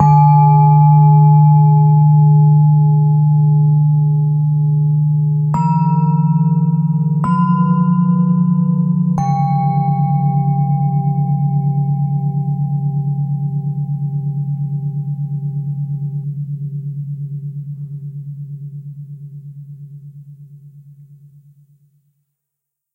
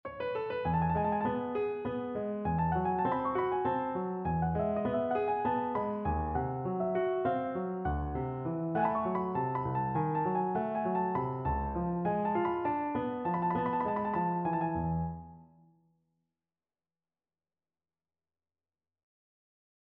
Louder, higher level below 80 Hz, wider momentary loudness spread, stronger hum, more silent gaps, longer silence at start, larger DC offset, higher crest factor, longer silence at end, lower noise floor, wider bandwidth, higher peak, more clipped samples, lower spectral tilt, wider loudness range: first, -14 LUFS vs -33 LUFS; about the same, -52 dBFS vs -50 dBFS; first, 19 LU vs 4 LU; neither; neither; about the same, 0 s vs 0.05 s; neither; about the same, 12 dB vs 14 dB; second, 2.15 s vs 4.45 s; second, -79 dBFS vs under -90 dBFS; second, 2.5 kHz vs 4.3 kHz; first, -2 dBFS vs -18 dBFS; neither; about the same, -12 dB/octave vs -11 dB/octave; first, 18 LU vs 3 LU